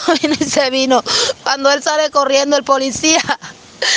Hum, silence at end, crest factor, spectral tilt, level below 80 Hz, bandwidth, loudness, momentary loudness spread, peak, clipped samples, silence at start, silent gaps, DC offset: none; 0 s; 14 dB; -1.5 dB/octave; -54 dBFS; 10.5 kHz; -14 LUFS; 5 LU; 0 dBFS; under 0.1%; 0 s; none; under 0.1%